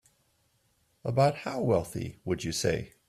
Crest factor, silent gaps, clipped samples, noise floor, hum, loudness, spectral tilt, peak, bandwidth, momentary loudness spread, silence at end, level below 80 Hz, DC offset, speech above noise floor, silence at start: 18 dB; none; under 0.1%; -71 dBFS; none; -30 LUFS; -5.5 dB/octave; -12 dBFS; 15 kHz; 11 LU; 0.2 s; -56 dBFS; under 0.1%; 42 dB; 1.05 s